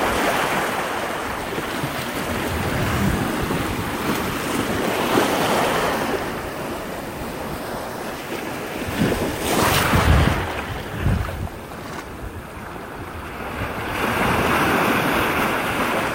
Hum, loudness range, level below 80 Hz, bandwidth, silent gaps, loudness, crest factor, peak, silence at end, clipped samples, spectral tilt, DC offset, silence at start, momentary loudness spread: none; 6 LU; -34 dBFS; 16 kHz; none; -22 LUFS; 18 dB; -4 dBFS; 0 s; under 0.1%; -4.5 dB/octave; under 0.1%; 0 s; 14 LU